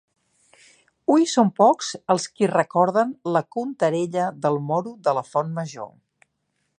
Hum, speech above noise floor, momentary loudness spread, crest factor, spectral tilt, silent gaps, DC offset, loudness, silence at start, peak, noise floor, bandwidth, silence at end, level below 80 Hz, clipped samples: none; 52 dB; 11 LU; 20 dB; -5.5 dB/octave; none; under 0.1%; -22 LUFS; 1.1 s; -4 dBFS; -74 dBFS; 10.5 kHz; 0.9 s; -74 dBFS; under 0.1%